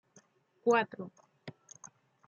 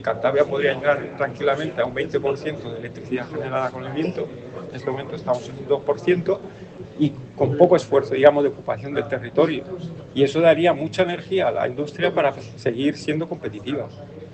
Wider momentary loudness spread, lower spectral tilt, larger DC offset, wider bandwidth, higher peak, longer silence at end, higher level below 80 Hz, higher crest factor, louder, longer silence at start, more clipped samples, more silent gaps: first, 23 LU vs 14 LU; second, -4.5 dB/octave vs -6.5 dB/octave; neither; second, 7.4 kHz vs 8.6 kHz; second, -14 dBFS vs 0 dBFS; first, 0.8 s vs 0 s; second, -86 dBFS vs -58 dBFS; about the same, 22 dB vs 22 dB; second, -31 LUFS vs -22 LUFS; first, 0.65 s vs 0 s; neither; neither